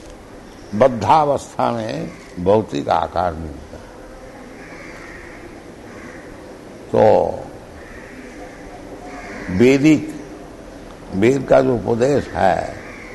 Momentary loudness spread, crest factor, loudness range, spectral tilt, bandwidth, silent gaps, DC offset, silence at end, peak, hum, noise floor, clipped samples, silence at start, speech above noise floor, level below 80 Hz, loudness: 23 LU; 18 dB; 11 LU; -6.5 dB/octave; 12 kHz; none; under 0.1%; 0 s; -2 dBFS; none; -38 dBFS; under 0.1%; 0 s; 22 dB; -44 dBFS; -17 LUFS